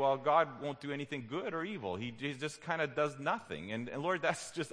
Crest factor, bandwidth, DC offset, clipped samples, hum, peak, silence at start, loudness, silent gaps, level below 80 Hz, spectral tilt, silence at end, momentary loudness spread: 20 dB; 10.5 kHz; under 0.1%; under 0.1%; none; -14 dBFS; 0 s; -36 LUFS; none; -74 dBFS; -5 dB/octave; 0 s; 10 LU